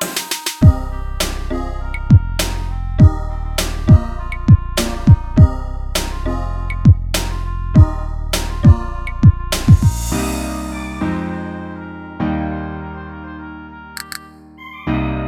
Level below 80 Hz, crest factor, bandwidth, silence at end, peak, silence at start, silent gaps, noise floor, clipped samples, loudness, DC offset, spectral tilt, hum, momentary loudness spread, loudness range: -22 dBFS; 16 dB; 17.5 kHz; 0 s; 0 dBFS; 0 s; none; -38 dBFS; under 0.1%; -16 LUFS; under 0.1%; -6 dB/octave; none; 17 LU; 10 LU